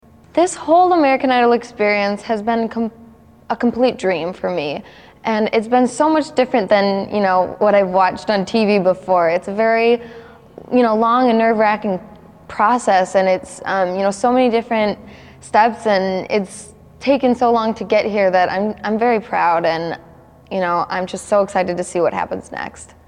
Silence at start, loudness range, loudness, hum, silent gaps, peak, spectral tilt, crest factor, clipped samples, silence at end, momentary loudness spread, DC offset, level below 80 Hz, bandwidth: 0.35 s; 4 LU; -17 LUFS; none; none; 0 dBFS; -5 dB/octave; 16 dB; under 0.1%; 0.25 s; 10 LU; under 0.1%; -54 dBFS; 11 kHz